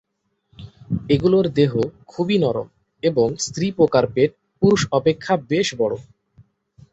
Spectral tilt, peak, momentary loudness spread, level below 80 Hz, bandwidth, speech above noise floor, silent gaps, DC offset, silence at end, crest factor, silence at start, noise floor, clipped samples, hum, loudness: -6 dB/octave; -2 dBFS; 10 LU; -50 dBFS; 8.2 kHz; 53 dB; none; under 0.1%; 0.9 s; 18 dB; 0.6 s; -72 dBFS; under 0.1%; none; -20 LUFS